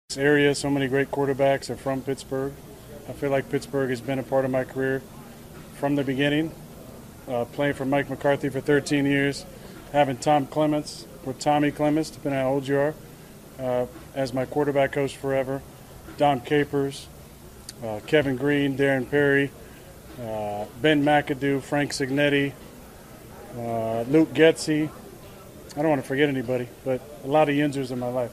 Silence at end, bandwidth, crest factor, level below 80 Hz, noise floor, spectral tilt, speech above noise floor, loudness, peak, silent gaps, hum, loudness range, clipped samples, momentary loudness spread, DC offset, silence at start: 0 s; 15.5 kHz; 22 dB; -52 dBFS; -45 dBFS; -5.5 dB/octave; 21 dB; -24 LUFS; -4 dBFS; none; none; 4 LU; under 0.1%; 22 LU; under 0.1%; 0.1 s